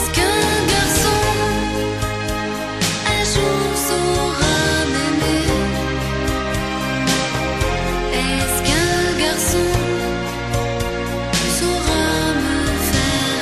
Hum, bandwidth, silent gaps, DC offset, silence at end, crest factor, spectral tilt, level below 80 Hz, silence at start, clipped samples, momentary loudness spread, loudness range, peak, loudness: none; 14 kHz; none; 0.3%; 0 s; 16 dB; -3.5 dB/octave; -30 dBFS; 0 s; under 0.1%; 6 LU; 2 LU; -2 dBFS; -18 LUFS